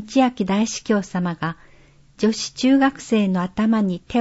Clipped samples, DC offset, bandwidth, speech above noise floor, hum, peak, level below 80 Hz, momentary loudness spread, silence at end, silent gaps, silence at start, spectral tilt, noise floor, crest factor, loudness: under 0.1%; under 0.1%; 8 kHz; 31 dB; none; -4 dBFS; -52 dBFS; 8 LU; 0 s; none; 0 s; -5.5 dB/octave; -50 dBFS; 16 dB; -21 LUFS